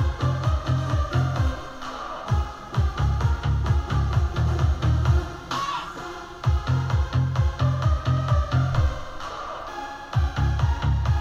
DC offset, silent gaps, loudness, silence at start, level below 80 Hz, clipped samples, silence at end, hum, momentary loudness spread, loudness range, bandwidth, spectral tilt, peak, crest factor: under 0.1%; none; -25 LUFS; 0 s; -28 dBFS; under 0.1%; 0 s; none; 11 LU; 2 LU; 7.8 kHz; -7 dB/octave; -10 dBFS; 14 dB